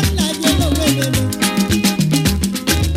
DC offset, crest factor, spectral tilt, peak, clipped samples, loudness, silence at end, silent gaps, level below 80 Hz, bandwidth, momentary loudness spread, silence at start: under 0.1%; 16 dB; -4.5 dB/octave; 0 dBFS; under 0.1%; -16 LUFS; 0 s; none; -28 dBFS; 16.5 kHz; 2 LU; 0 s